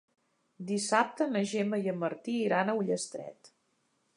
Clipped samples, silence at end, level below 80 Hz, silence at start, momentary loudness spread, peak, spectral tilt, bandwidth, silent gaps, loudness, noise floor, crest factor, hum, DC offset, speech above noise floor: under 0.1%; 0.7 s; -84 dBFS; 0.6 s; 12 LU; -12 dBFS; -4.5 dB/octave; 11.5 kHz; none; -31 LUFS; -75 dBFS; 22 dB; none; under 0.1%; 44 dB